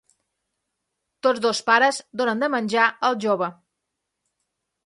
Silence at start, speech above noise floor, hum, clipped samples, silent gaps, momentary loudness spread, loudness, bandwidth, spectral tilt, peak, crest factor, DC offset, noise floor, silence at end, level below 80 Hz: 1.25 s; 59 dB; none; under 0.1%; none; 7 LU; -21 LUFS; 11.5 kHz; -3.5 dB/octave; -2 dBFS; 22 dB; under 0.1%; -80 dBFS; 1.35 s; -74 dBFS